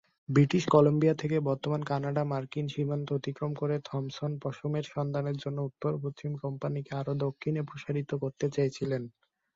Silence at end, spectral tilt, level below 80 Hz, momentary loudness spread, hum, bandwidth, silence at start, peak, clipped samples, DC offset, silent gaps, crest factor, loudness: 0.45 s; -7.5 dB/octave; -66 dBFS; 10 LU; none; 7.6 kHz; 0.3 s; -8 dBFS; under 0.1%; under 0.1%; none; 22 dB; -31 LUFS